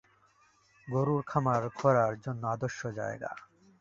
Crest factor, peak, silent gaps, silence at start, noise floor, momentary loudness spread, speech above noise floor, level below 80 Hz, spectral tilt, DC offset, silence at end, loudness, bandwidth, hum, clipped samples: 22 dB; -10 dBFS; none; 0.85 s; -66 dBFS; 12 LU; 36 dB; -66 dBFS; -7.5 dB/octave; under 0.1%; 0.4 s; -31 LUFS; 7.6 kHz; none; under 0.1%